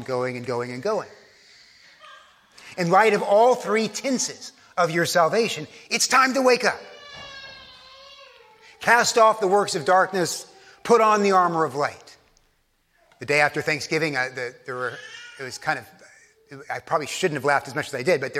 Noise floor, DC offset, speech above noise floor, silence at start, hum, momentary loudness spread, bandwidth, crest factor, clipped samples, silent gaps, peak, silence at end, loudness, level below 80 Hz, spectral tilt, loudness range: -66 dBFS; under 0.1%; 45 dB; 0 s; none; 20 LU; 16 kHz; 20 dB; under 0.1%; none; -4 dBFS; 0 s; -22 LUFS; -68 dBFS; -3.5 dB/octave; 7 LU